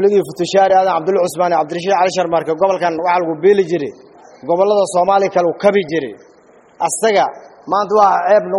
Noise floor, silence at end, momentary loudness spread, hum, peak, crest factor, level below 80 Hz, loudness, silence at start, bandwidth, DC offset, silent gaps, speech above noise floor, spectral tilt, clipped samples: -47 dBFS; 0 s; 9 LU; none; 0 dBFS; 14 dB; -60 dBFS; -15 LUFS; 0 s; 11.5 kHz; under 0.1%; none; 33 dB; -4.5 dB/octave; under 0.1%